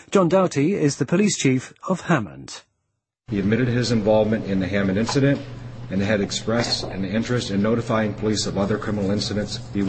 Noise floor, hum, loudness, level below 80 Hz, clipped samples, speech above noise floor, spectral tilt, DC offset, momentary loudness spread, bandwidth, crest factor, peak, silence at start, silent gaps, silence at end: -77 dBFS; none; -22 LUFS; -46 dBFS; under 0.1%; 56 dB; -5.5 dB/octave; under 0.1%; 9 LU; 8.8 kHz; 18 dB; -4 dBFS; 0.1 s; none; 0 s